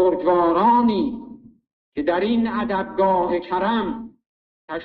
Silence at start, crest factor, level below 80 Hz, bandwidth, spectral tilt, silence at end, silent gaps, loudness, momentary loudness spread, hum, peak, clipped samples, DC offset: 0 s; 14 dB; -52 dBFS; 4.9 kHz; -9.5 dB/octave; 0 s; 1.73-1.92 s, 4.26-4.68 s; -20 LUFS; 17 LU; none; -6 dBFS; under 0.1%; under 0.1%